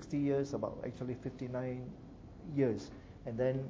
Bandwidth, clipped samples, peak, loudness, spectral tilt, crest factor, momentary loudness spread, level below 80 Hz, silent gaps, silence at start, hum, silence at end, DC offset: 7.8 kHz; under 0.1%; -20 dBFS; -38 LUFS; -8 dB/octave; 18 dB; 16 LU; -60 dBFS; none; 0 s; none; 0 s; under 0.1%